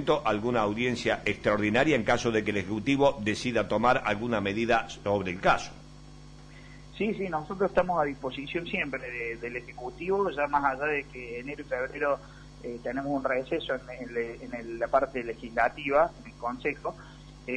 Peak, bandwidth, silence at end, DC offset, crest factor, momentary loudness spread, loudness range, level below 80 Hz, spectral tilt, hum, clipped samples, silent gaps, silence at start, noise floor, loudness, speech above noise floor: -10 dBFS; 10.5 kHz; 0 s; under 0.1%; 18 dB; 13 LU; 6 LU; -52 dBFS; -5.5 dB/octave; 50 Hz at -50 dBFS; under 0.1%; none; 0 s; -48 dBFS; -29 LUFS; 20 dB